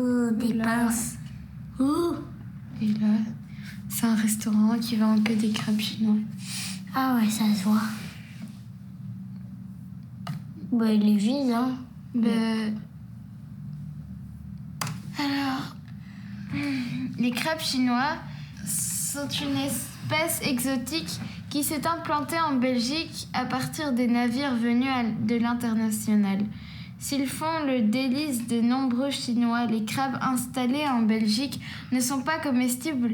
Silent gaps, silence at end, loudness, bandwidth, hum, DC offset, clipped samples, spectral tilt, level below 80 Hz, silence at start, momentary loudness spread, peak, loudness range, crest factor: none; 0 s; -26 LUFS; 19 kHz; none; under 0.1%; under 0.1%; -4.5 dB/octave; -56 dBFS; 0 s; 16 LU; -10 dBFS; 6 LU; 16 dB